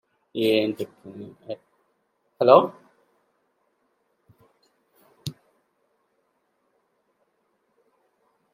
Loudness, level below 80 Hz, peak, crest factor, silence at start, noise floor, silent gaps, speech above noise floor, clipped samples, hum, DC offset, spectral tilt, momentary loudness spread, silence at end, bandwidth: -21 LUFS; -76 dBFS; -2 dBFS; 28 dB; 0.35 s; -72 dBFS; none; 50 dB; under 0.1%; none; under 0.1%; -6 dB/octave; 24 LU; 3.25 s; 16 kHz